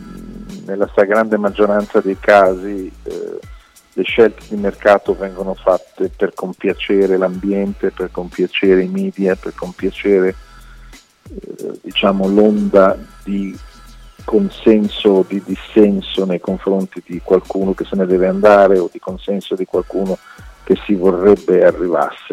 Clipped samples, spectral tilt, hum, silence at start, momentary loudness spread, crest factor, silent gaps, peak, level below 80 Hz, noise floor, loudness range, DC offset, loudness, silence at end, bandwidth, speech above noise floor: under 0.1%; -7 dB/octave; none; 0 s; 15 LU; 16 dB; none; 0 dBFS; -40 dBFS; -40 dBFS; 3 LU; under 0.1%; -15 LUFS; 0 s; 13 kHz; 26 dB